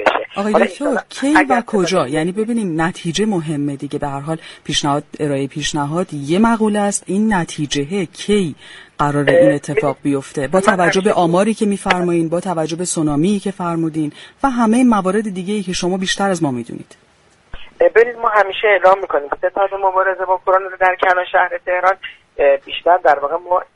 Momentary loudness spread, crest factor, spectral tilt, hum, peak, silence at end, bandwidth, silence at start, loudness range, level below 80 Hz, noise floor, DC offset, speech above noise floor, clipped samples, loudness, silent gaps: 9 LU; 16 dB; -5 dB/octave; none; 0 dBFS; 0.1 s; 11.5 kHz; 0 s; 4 LU; -46 dBFS; -53 dBFS; under 0.1%; 37 dB; under 0.1%; -16 LUFS; none